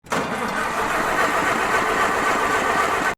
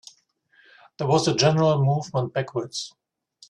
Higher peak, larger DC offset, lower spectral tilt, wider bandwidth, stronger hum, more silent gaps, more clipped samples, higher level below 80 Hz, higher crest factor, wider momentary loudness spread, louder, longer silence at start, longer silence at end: about the same, -6 dBFS vs -6 dBFS; neither; second, -3 dB/octave vs -5.5 dB/octave; first, 19.5 kHz vs 10.5 kHz; neither; neither; neither; first, -46 dBFS vs -62 dBFS; about the same, 14 dB vs 18 dB; second, 4 LU vs 13 LU; first, -20 LUFS vs -23 LUFS; second, 0.05 s vs 1 s; second, 0.05 s vs 0.6 s